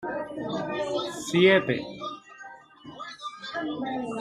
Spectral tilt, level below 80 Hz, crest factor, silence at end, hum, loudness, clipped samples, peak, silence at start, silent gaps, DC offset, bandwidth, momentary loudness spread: -5 dB/octave; -66 dBFS; 20 dB; 0 s; none; -27 LUFS; under 0.1%; -8 dBFS; 0 s; none; under 0.1%; 13 kHz; 25 LU